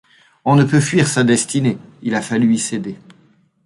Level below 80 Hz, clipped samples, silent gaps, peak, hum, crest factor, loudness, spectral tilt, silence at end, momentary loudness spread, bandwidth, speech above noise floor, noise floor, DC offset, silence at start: -56 dBFS; under 0.1%; none; -2 dBFS; none; 14 dB; -16 LUFS; -5 dB/octave; 0.7 s; 12 LU; 11.5 kHz; 38 dB; -54 dBFS; under 0.1%; 0.45 s